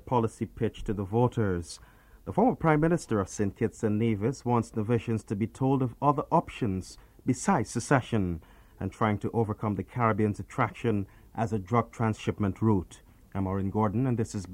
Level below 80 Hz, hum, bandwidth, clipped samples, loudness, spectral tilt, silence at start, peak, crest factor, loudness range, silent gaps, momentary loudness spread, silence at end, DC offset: -52 dBFS; none; 12.5 kHz; under 0.1%; -29 LUFS; -7 dB/octave; 0.05 s; -6 dBFS; 22 dB; 2 LU; none; 8 LU; 0 s; under 0.1%